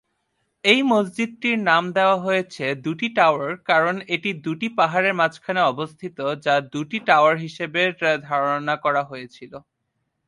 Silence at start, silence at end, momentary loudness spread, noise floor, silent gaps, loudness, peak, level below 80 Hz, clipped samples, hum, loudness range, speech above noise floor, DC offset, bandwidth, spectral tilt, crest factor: 0.65 s; 0.7 s; 10 LU; -75 dBFS; none; -21 LUFS; -2 dBFS; -70 dBFS; under 0.1%; none; 2 LU; 54 dB; under 0.1%; 11.5 kHz; -5 dB/octave; 20 dB